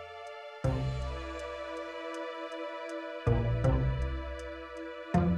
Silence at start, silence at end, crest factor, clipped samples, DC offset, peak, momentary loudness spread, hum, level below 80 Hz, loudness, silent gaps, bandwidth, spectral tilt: 0 s; 0 s; 20 dB; under 0.1%; under 0.1%; -14 dBFS; 13 LU; none; -40 dBFS; -35 LUFS; none; 9.8 kHz; -7.5 dB/octave